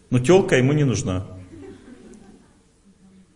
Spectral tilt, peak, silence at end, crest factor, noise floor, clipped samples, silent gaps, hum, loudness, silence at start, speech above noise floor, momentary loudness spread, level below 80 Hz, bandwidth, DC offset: -6 dB/octave; -2 dBFS; 1.6 s; 20 dB; -55 dBFS; under 0.1%; none; none; -19 LUFS; 0.1 s; 37 dB; 26 LU; -48 dBFS; 11 kHz; under 0.1%